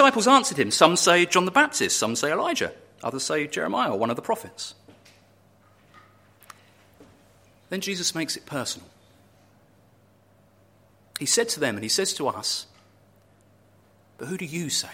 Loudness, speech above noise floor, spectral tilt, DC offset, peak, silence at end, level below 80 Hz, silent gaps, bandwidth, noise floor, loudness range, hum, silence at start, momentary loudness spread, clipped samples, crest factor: -23 LUFS; 35 dB; -2.5 dB/octave; under 0.1%; -2 dBFS; 0 s; -70 dBFS; none; 16.5 kHz; -59 dBFS; 13 LU; none; 0 s; 16 LU; under 0.1%; 24 dB